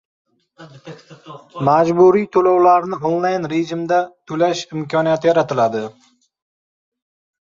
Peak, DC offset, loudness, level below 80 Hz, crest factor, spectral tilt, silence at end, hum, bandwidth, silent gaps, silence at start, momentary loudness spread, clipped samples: -2 dBFS; under 0.1%; -16 LUFS; -62 dBFS; 16 dB; -6.5 dB/octave; 1.65 s; none; 7.6 kHz; none; 0.6 s; 12 LU; under 0.1%